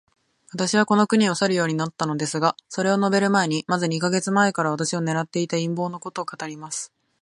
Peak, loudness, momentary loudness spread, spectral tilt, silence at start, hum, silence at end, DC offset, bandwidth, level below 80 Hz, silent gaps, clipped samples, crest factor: -4 dBFS; -22 LUFS; 12 LU; -4.5 dB/octave; 0.55 s; none; 0.35 s; under 0.1%; 11.5 kHz; -68 dBFS; none; under 0.1%; 20 dB